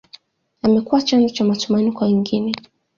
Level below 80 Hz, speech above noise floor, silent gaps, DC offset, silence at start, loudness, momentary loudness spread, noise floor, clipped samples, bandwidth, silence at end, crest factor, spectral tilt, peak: -58 dBFS; 31 dB; none; under 0.1%; 0.65 s; -18 LUFS; 6 LU; -48 dBFS; under 0.1%; 7.4 kHz; 0.4 s; 16 dB; -6 dB/octave; -4 dBFS